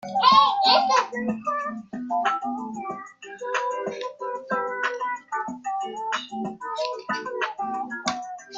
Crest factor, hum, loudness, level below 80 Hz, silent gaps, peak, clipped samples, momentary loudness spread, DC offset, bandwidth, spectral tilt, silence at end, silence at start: 22 dB; none; -25 LUFS; -70 dBFS; none; -4 dBFS; under 0.1%; 15 LU; under 0.1%; 7.8 kHz; -3 dB/octave; 0 s; 0 s